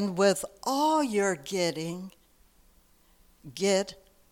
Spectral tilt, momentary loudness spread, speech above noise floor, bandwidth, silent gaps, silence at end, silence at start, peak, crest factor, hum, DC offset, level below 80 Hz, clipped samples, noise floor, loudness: -4 dB/octave; 14 LU; 34 dB; 17 kHz; none; 0.35 s; 0 s; -12 dBFS; 18 dB; none; under 0.1%; -64 dBFS; under 0.1%; -62 dBFS; -28 LUFS